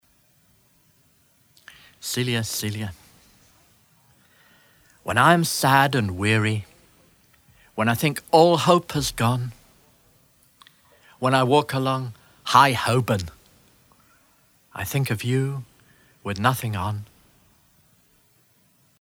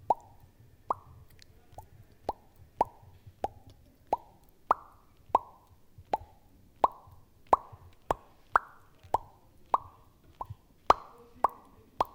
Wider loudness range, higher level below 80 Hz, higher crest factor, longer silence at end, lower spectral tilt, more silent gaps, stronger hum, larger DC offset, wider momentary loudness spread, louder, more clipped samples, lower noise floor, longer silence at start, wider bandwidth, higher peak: about the same, 9 LU vs 7 LU; about the same, -54 dBFS vs -58 dBFS; second, 24 dB vs 30 dB; first, 1.95 s vs 0.1 s; about the same, -5 dB/octave vs -5 dB/octave; neither; neither; neither; second, 18 LU vs 24 LU; first, -21 LUFS vs -33 LUFS; neither; about the same, -61 dBFS vs -59 dBFS; first, 2.05 s vs 0.1 s; first, over 20 kHz vs 17.5 kHz; first, 0 dBFS vs -6 dBFS